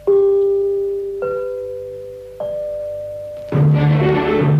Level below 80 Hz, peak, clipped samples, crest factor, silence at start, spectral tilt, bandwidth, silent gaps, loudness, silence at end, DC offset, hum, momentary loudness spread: -44 dBFS; -4 dBFS; under 0.1%; 12 dB; 0 s; -9.5 dB/octave; 5.2 kHz; none; -18 LUFS; 0 s; under 0.1%; none; 15 LU